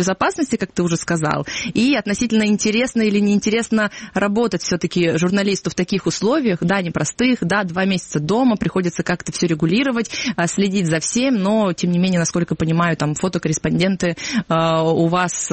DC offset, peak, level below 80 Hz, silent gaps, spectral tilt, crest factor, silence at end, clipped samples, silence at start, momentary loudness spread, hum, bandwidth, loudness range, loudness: under 0.1%; -4 dBFS; -48 dBFS; none; -5 dB/octave; 14 dB; 0 s; under 0.1%; 0 s; 4 LU; none; 8.8 kHz; 1 LU; -18 LUFS